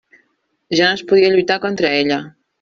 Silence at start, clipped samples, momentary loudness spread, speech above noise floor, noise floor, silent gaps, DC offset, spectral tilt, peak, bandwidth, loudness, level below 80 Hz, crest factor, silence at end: 0.7 s; under 0.1%; 7 LU; 50 dB; -65 dBFS; none; under 0.1%; -4.5 dB/octave; -2 dBFS; 7.4 kHz; -15 LUFS; -58 dBFS; 14 dB; 0.3 s